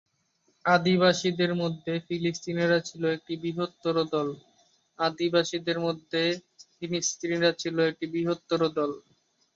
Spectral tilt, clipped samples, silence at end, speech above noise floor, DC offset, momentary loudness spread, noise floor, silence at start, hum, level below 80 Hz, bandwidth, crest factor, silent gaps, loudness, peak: -4.5 dB/octave; under 0.1%; 0.55 s; 44 dB; under 0.1%; 9 LU; -71 dBFS; 0.65 s; none; -70 dBFS; 7.8 kHz; 22 dB; none; -27 LUFS; -6 dBFS